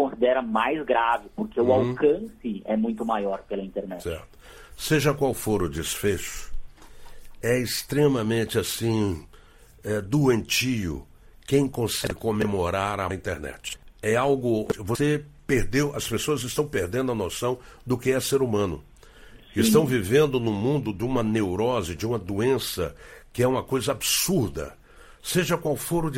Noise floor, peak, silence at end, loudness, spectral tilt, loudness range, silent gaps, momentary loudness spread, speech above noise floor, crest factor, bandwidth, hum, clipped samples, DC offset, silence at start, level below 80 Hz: -51 dBFS; -6 dBFS; 0 s; -25 LUFS; -5 dB/octave; 3 LU; none; 11 LU; 26 dB; 20 dB; 16.5 kHz; none; under 0.1%; under 0.1%; 0 s; -44 dBFS